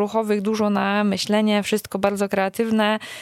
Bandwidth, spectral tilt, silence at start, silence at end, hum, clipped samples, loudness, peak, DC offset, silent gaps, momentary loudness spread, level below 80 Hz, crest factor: 15.5 kHz; -5 dB/octave; 0 s; 0 s; none; under 0.1%; -21 LUFS; -4 dBFS; under 0.1%; none; 3 LU; -60 dBFS; 16 dB